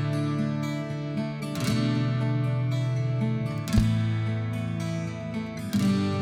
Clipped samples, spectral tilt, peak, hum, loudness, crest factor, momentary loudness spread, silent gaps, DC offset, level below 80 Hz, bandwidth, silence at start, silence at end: under 0.1%; -7 dB/octave; -10 dBFS; none; -28 LUFS; 18 dB; 7 LU; none; under 0.1%; -44 dBFS; 15 kHz; 0 s; 0 s